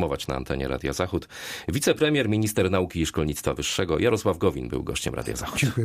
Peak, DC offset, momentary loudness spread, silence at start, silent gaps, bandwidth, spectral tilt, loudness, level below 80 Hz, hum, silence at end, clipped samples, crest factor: -8 dBFS; under 0.1%; 8 LU; 0 s; none; 15.5 kHz; -5 dB/octave; -26 LUFS; -42 dBFS; none; 0 s; under 0.1%; 18 dB